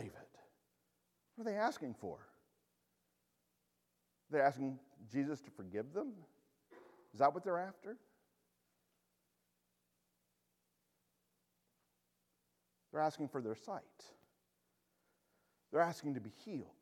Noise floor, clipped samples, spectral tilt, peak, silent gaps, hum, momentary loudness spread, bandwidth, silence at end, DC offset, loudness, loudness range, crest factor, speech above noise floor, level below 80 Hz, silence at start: -84 dBFS; under 0.1%; -6.5 dB/octave; -18 dBFS; none; 60 Hz at -85 dBFS; 19 LU; 16 kHz; 0.1 s; under 0.1%; -41 LUFS; 5 LU; 26 dB; 44 dB; -88 dBFS; 0 s